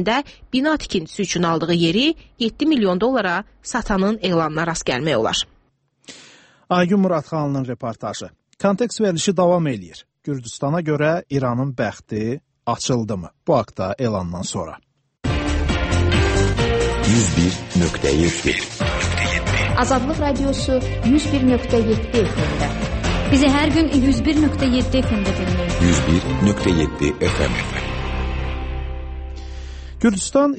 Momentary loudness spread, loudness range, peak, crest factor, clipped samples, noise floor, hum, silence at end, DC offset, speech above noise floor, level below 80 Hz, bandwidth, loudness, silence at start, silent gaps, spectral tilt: 10 LU; 5 LU; -2 dBFS; 16 dB; under 0.1%; -61 dBFS; none; 0 s; under 0.1%; 42 dB; -30 dBFS; 8.8 kHz; -20 LUFS; 0 s; none; -5.5 dB/octave